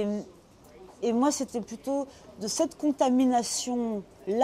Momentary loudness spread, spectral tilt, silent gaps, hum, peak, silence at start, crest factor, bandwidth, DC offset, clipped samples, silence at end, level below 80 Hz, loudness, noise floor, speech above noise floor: 12 LU; -4 dB/octave; none; none; -12 dBFS; 0 s; 18 dB; 15.5 kHz; under 0.1%; under 0.1%; 0 s; -64 dBFS; -28 LUFS; -52 dBFS; 24 dB